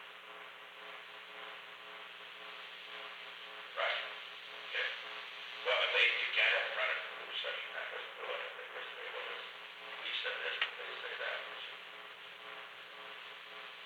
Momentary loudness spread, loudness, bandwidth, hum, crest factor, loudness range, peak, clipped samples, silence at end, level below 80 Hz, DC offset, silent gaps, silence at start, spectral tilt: 18 LU; -38 LUFS; 19 kHz; none; 22 dB; 11 LU; -18 dBFS; under 0.1%; 0 s; under -90 dBFS; under 0.1%; none; 0 s; -0.5 dB/octave